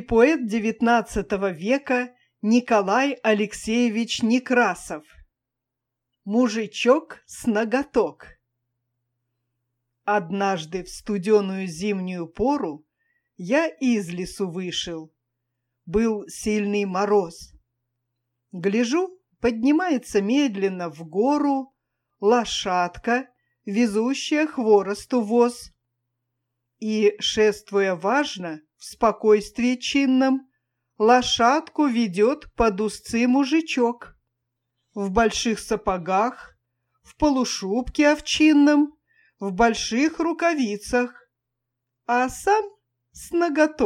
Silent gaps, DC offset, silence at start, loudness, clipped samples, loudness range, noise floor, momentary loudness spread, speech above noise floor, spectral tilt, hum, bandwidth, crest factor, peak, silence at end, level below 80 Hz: none; under 0.1%; 0 s; -22 LUFS; under 0.1%; 5 LU; -84 dBFS; 12 LU; 63 dB; -4.5 dB/octave; none; 14.5 kHz; 20 dB; -4 dBFS; 0 s; -50 dBFS